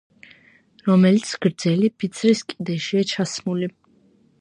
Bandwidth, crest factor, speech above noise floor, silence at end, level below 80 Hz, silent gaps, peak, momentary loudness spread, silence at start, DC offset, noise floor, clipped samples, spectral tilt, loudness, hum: 10.5 kHz; 18 dB; 38 dB; 0.7 s; -66 dBFS; none; -4 dBFS; 11 LU; 0.85 s; under 0.1%; -58 dBFS; under 0.1%; -6 dB/octave; -21 LUFS; none